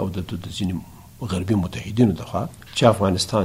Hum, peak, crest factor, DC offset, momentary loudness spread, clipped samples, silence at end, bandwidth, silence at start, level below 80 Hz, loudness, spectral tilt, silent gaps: none; 0 dBFS; 22 dB; under 0.1%; 12 LU; under 0.1%; 0 s; 16 kHz; 0 s; -46 dBFS; -22 LUFS; -6 dB/octave; none